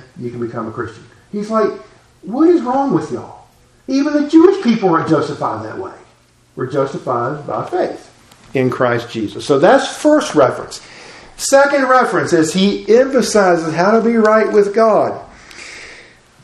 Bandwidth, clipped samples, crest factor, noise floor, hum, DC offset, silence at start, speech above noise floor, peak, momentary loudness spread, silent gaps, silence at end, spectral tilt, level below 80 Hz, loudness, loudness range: 13.5 kHz; under 0.1%; 16 dB; -51 dBFS; none; under 0.1%; 0.15 s; 37 dB; 0 dBFS; 17 LU; none; 0.45 s; -5 dB/octave; -54 dBFS; -14 LUFS; 7 LU